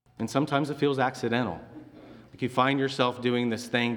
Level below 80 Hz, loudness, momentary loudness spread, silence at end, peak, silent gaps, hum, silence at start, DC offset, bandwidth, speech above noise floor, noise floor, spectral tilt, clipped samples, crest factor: -66 dBFS; -27 LUFS; 10 LU; 0 s; -8 dBFS; none; none; 0.2 s; under 0.1%; 19 kHz; 22 dB; -49 dBFS; -5.5 dB/octave; under 0.1%; 20 dB